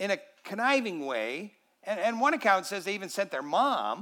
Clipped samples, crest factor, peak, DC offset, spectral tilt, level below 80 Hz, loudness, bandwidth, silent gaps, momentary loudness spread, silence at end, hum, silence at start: under 0.1%; 20 dB; -10 dBFS; under 0.1%; -3.5 dB/octave; under -90 dBFS; -29 LUFS; 19 kHz; none; 12 LU; 0 s; none; 0 s